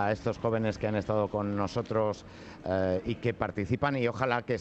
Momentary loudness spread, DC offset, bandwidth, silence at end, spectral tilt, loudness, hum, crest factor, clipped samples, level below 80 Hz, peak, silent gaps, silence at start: 4 LU; under 0.1%; 8.2 kHz; 0 s; -7.5 dB/octave; -31 LUFS; none; 18 dB; under 0.1%; -54 dBFS; -12 dBFS; none; 0 s